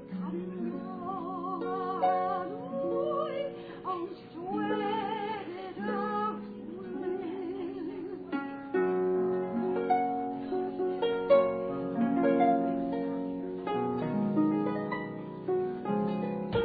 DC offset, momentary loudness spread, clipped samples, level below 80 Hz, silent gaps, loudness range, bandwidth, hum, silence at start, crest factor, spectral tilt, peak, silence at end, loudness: under 0.1%; 11 LU; under 0.1%; -64 dBFS; none; 6 LU; 4.9 kHz; none; 0 s; 18 dB; -6 dB/octave; -12 dBFS; 0 s; -32 LUFS